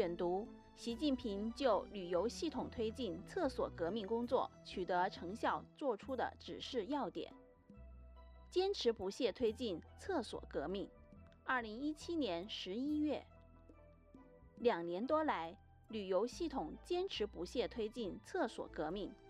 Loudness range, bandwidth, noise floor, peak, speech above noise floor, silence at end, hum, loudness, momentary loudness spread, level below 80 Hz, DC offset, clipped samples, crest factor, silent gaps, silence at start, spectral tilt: 3 LU; 13.5 kHz; -63 dBFS; -22 dBFS; 22 dB; 0 s; none; -41 LUFS; 10 LU; -62 dBFS; under 0.1%; under 0.1%; 20 dB; none; 0 s; -5 dB/octave